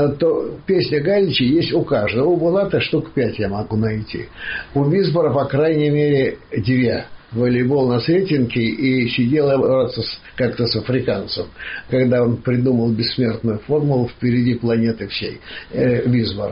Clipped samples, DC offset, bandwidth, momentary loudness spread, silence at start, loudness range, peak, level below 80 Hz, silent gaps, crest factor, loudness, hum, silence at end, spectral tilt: under 0.1%; 0.2%; 5.6 kHz; 9 LU; 0 s; 2 LU; -8 dBFS; -46 dBFS; none; 10 dB; -18 LUFS; none; 0 s; -5.5 dB/octave